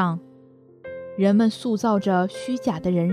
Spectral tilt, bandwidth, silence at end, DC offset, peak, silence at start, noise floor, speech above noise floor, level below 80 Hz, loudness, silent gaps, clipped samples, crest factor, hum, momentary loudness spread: -7 dB/octave; 11 kHz; 0 s; under 0.1%; -8 dBFS; 0 s; -51 dBFS; 29 dB; -60 dBFS; -22 LUFS; none; under 0.1%; 16 dB; none; 17 LU